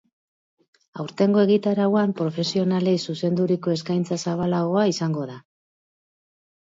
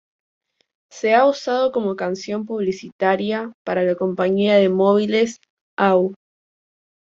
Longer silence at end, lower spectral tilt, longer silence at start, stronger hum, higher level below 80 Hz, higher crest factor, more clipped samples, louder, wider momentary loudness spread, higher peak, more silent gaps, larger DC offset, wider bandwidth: first, 1.25 s vs 0.9 s; about the same, -6.5 dB/octave vs -6 dB/octave; about the same, 0.95 s vs 0.95 s; neither; about the same, -66 dBFS vs -64 dBFS; about the same, 16 dB vs 16 dB; neither; second, -22 LUFS vs -19 LUFS; about the same, 9 LU vs 10 LU; second, -8 dBFS vs -4 dBFS; second, none vs 2.92-2.99 s, 3.54-3.65 s, 5.50-5.77 s; neither; about the same, 7.8 kHz vs 7.6 kHz